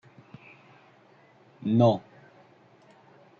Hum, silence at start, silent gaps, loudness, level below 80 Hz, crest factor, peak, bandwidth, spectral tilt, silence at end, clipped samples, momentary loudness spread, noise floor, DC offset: none; 1.65 s; none; -25 LUFS; -72 dBFS; 20 dB; -10 dBFS; 6.8 kHz; -9 dB/octave; 1.4 s; under 0.1%; 28 LU; -58 dBFS; under 0.1%